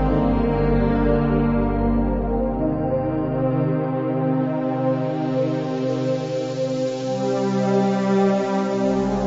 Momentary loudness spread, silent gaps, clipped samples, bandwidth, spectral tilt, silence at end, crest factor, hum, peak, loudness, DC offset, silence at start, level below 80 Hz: 4 LU; none; under 0.1%; 7.8 kHz; -8 dB/octave; 0 s; 14 dB; none; -6 dBFS; -21 LUFS; under 0.1%; 0 s; -32 dBFS